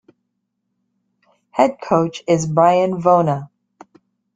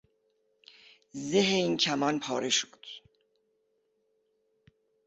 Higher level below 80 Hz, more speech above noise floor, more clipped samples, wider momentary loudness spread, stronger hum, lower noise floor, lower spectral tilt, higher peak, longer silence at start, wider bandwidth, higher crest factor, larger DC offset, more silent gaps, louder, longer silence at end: first, -60 dBFS vs -74 dBFS; first, 58 dB vs 46 dB; neither; second, 7 LU vs 20 LU; neither; about the same, -74 dBFS vs -75 dBFS; first, -6.5 dB/octave vs -3 dB/octave; first, -2 dBFS vs -12 dBFS; first, 1.55 s vs 1.15 s; first, 9.4 kHz vs 8.4 kHz; about the same, 18 dB vs 20 dB; neither; neither; first, -17 LUFS vs -28 LUFS; second, 0.9 s vs 2.1 s